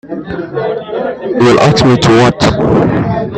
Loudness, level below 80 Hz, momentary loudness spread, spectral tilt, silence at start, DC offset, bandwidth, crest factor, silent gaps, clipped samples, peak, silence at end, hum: -10 LUFS; -34 dBFS; 11 LU; -6 dB/octave; 0.05 s; under 0.1%; 11 kHz; 10 dB; none; under 0.1%; 0 dBFS; 0 s; none